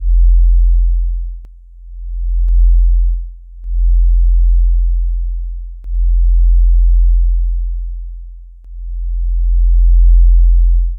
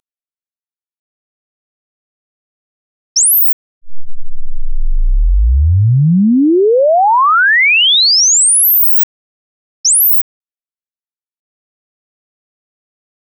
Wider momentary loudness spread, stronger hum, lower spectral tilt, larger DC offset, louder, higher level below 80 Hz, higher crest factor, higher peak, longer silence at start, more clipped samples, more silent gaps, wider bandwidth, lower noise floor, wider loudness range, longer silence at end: first, 17 LU vs 12 LU; neither; first, -12.5 dB/octave vs -3 dB/octave; neither; second, -15 LUFS vs -9 LUFS; first, -10 dBFS vs -20 dBFS; about the same, 8 dB vs 6 dB; first, -2 dBFS vs -6 dBFS; second, 0 s vs 3.15 s; neither; second, none vs 3.53-3.81 s, 9.03-9.84 s; second, 0.2 kHz vs 2.5 kHz; second, -34 dBFS vs under -90 dBFS; second, 2 LU vs 7 LU; second, 0 s vs 3.15 s